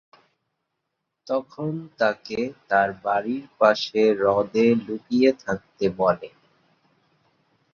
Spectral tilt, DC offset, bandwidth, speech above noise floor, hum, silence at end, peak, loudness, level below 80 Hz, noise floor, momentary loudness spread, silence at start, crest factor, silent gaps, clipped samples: -6 dB/octave; under 0.1%; 7 kHz; 57 dB; none; 1.45 s; -4 dBFS; -23 LUFS; -62 dBFS; -80 dBFS; 11 LU; 1.3 s; 22 dB; none; under 0.1%